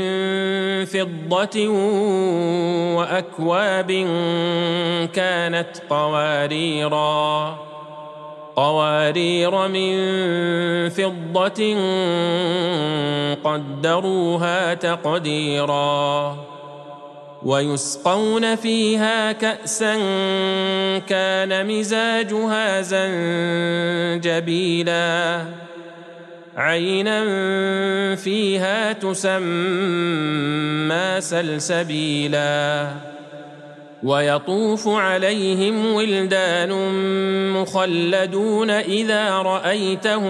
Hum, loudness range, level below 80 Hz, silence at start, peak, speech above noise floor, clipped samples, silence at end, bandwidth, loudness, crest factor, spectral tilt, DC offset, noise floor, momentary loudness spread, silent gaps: none; 2 LU; -74 dBFS; 0 s; -2 dBFS; 20 dB; under 0.1%; 0 s; 12.5 kHz; -20 LUFS; 18 dB; -4.5 dB/octave; under 0.1%; -40 dBFS; 6 LU; none